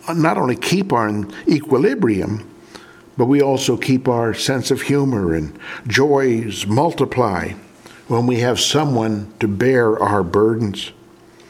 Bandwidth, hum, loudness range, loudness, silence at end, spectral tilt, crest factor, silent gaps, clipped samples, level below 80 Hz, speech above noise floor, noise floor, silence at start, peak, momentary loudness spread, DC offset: 16.5 kHz; none; 1 LU; -17 LUFS; 0.6 s; -5.5 dB/octave; 18 dB; none; under 0.1%; -48 dBFS; 28 dB; -45 dBFS; 0.05 s; 0 dBFS; 9 LU; under 0.1%